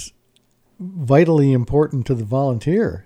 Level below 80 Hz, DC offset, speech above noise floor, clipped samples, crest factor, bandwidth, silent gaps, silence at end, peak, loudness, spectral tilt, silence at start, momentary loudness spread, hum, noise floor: -42 dBFS; under 0.1%; 44 dB; under 0.1%; 16 dB; 10.5 kHz; none; 0.05 s; -2 dBFS; -17 LUFS; -8.5 dB/octave; 0 s; 18 LU; none; -61 dBFS